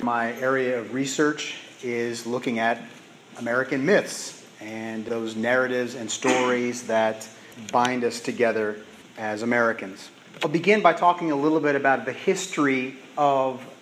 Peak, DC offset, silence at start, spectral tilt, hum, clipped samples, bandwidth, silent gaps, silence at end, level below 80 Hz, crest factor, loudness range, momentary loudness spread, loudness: -4 dBFS; under 0.1%; 0 s; -4 dB/octave; none; under 0.1%; 15 kHz; none; 0.05 s; -76 dBFS; 20 dB; 4 LU; 13 LU; -24 LUFS